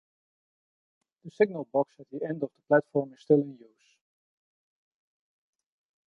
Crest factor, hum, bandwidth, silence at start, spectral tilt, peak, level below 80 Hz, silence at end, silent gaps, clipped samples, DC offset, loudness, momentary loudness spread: 22 dB; none; 6.6 kHz; 1.25 s; -9 dB/octave; -10 dBFS; -80 dBFS; 2.5 s; none; under 0.1%; under 0.1%; -28 LUFS; 10 LU